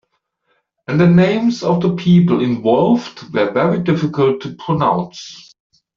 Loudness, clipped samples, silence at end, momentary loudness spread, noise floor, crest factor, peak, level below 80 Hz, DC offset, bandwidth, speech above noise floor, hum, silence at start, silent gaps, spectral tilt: -15 LUFS; under 0.1%; 0.55 s; 11 LU; -67 dBFS; 14 dB; -2 dBFS; -52 dBFS; under 0.1%; 7 kHz; 52 dB; none; 0.9 s; none; -8 dB/octave